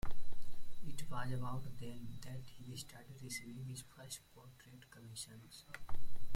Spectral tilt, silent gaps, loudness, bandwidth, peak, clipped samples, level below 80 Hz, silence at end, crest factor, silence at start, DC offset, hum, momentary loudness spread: -4.5 dB/octave; none; -49 LUFS; 15 kHz; -22 dBFS; under 0.1%; -52 dBFS; 0 s; 12 dB; 0.05 s; under 0.1%; none; 15 LU